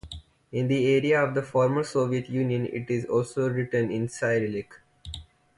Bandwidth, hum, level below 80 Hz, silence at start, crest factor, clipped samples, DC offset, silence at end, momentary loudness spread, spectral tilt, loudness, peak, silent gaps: 11.5 kHz; none; -54 dBFS; 0.05 s; 14 dB; under 0.1%; under 0.1%; 0.35 s; 19 LU; -6.5 dB/octave; -26 LUFS; -12 dBFS; none